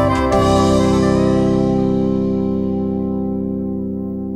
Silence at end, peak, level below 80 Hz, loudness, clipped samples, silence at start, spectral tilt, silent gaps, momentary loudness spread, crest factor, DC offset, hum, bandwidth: 0 s; -2 dBFS; -32 dBFS; -17 LUFS; under 0.1%; 0 s; -7 dB/octave; none; 9 LU; 14 dB; under 0.1%; none; 12 kHz